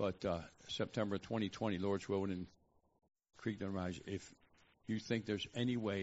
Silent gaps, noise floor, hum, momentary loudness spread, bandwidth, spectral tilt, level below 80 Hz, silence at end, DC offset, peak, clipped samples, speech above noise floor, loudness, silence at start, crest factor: none; -69 dBFS; none; 9 LU; 8 kHz; -5 dB/octave; -70 dBFS; 0 s; under 0.1%; -22 dBFS; under 0.1%; 29 dB; -41 LUFS; 0 s; 18 dB